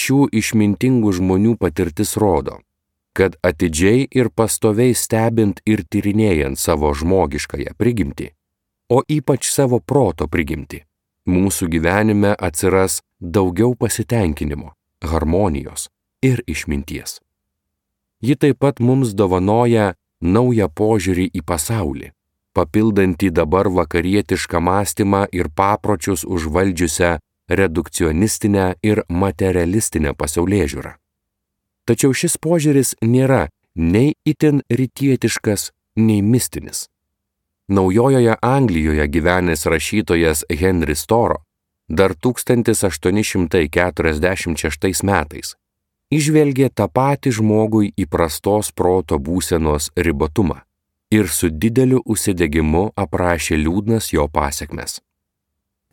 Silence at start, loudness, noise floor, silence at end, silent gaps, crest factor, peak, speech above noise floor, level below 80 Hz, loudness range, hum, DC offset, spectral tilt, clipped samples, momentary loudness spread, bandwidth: 0 s; -17 LUFS; -78 dBFS; 0.95 s; none; 16 dB; 0 dBFS; 61 dB; -34 dBFS; 3 LU; none; under 0.1%; -5.5 dB/octave; under 0.1%; 9 LU; 18.5 kHz